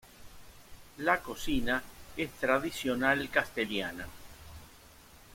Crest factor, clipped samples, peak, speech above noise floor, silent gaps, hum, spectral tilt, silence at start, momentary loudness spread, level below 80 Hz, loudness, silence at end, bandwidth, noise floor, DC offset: 24 dB; under 0.1%; -10 dBFS; 24 dB; none; none; -4 dB/octave; 0.05 s; 22 LU; -52 dBFS; -31 LUFS; 0 s; 16.5 kHz; -55 dBFS; under 0.1%